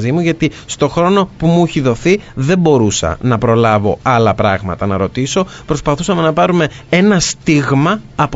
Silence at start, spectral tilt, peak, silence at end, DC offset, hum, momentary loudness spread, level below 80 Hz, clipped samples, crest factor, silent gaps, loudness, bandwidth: 0 s; -5.5 dB/octave; 0 dBFS; 0 s; under 0.1%; none; 6 LU; -36 dBFS; under 0.1%; 12 dB; none; -13 LUFS; 8 kHz